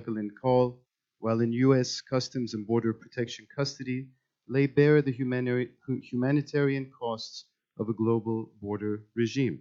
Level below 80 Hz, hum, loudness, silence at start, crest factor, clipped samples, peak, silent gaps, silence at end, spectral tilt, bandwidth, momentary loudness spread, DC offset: -68 dBFS; none; -29 LUFS; 0 s; 20 dB; under 0.1%; -10 dBFS; none; 0 s; -6.5 dB/octave; 7.6 kHz; 12 LU; under 0.1%